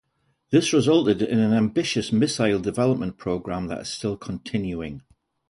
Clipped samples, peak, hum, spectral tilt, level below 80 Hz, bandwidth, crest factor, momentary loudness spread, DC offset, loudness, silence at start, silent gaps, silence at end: under 0.1%; -6 dBFS; none; -5.5 dB/octave; -52 dBFS; 11.5 kHz; 18 dB; 11 LU; under 0.1%; -23 LUFS; 0.5 s; none; 0.5 s